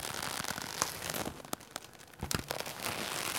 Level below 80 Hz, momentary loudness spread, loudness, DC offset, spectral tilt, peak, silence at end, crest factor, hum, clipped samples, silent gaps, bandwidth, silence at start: -58 dBFS; 11 LU; -37 LUFS; under 0.1%; -2 dB/octave; -8 dBFS; 0 s; 32 dB; none; under 0.1%; none; 17 kHz; 0 s